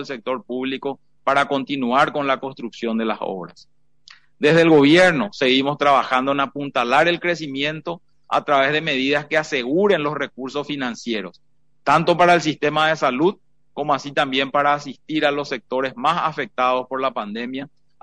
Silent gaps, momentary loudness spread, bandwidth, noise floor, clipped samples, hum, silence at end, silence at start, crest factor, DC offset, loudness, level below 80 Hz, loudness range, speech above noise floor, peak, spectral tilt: none; 13 LU; 10 kHz; -51 dBFS; under 0.1%; none; 0.35 s; 0 s; 16 dB; 0.2%; -19 LUFS; -62 dBFS; 5 LU; 31 dB; -4 dBFS; -5 dB/octave